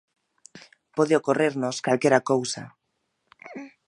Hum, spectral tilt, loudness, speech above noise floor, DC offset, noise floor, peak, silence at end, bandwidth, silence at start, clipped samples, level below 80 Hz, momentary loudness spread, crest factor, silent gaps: none; -5 dB/octave; -24 LUFS; 53 dB; under 0.1%; -75 dBFS; -4 dBFS; 0.2 s; 11 kHz; 0.55 s; under 0.1%; -74 dBFS; 20 LU; 22 dB; none